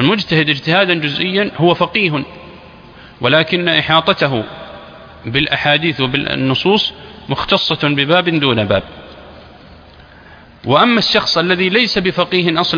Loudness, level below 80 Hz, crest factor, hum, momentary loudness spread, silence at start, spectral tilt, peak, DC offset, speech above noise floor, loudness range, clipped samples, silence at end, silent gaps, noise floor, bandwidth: -13 LUFS; -46 dBFS; 16 dB; none; 10 LU; 0 s; -6 dB/octave; 0 dBFS; under 0.1%; 26 dB; 2 LU; under 0.1%; 0 s; none; -40 dBFS; 5.4 kHz